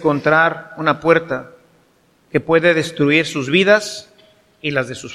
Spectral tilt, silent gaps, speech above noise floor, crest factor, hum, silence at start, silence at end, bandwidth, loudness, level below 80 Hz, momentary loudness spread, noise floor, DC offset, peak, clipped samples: -5 dB/octave; none; 40 dB; 18 dB; none; 0 s; 0 s; 13 kHz; -16 LUFS; -56 dBFS; 13 LU; -56 dBFS; under 0.1%; 0 dBFS; under 0.1%